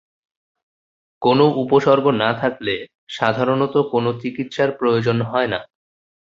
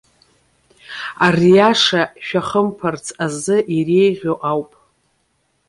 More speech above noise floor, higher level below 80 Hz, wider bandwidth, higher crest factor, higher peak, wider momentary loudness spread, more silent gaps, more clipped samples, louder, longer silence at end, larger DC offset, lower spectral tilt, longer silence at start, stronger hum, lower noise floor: first, over 72 dB vs 49 dB; about the same, -58 dBFS vs -56 dBFS; second, 7.6 kHz vs 11.5 kHz; about the same, 18 dB vs 16 dB; about the same, 0 dBFS vs -2 dBFS; second, 10 LU vs 13 LU; first, 2.95-3.07 s vs none; neither; second, -19 LUFS vs -16 LUFS; second, 0.7 s vs 1.05 s; neither; first, -7 dB/octave vs -5 dB/octave; first, 1.2 s vs 0.9 s; neither; first, under -90 dBFS vs -65 dBFS